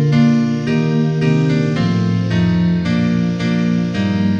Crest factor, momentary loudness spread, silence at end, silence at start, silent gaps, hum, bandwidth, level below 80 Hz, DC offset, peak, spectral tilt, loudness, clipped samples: 12 dB; 3 LU; 0 s; 0 s; none; none; 7.6 kHz; -44 dBFS; 0.1%; -4 dBFS; -8 dB/octave; -16 LUFS; under 0.1%